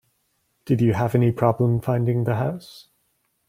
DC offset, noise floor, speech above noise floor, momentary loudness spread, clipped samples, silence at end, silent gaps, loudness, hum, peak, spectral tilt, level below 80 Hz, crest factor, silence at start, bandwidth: under 0.1%; -70 dBFS; 49 dB; 6 LU; under 0.1%; 0.65 s; none; -22 LUFS; none; -4 dBFS; -9 dB/octave; -56 dBFS; 18 dB; 0.65 s; 15 kHz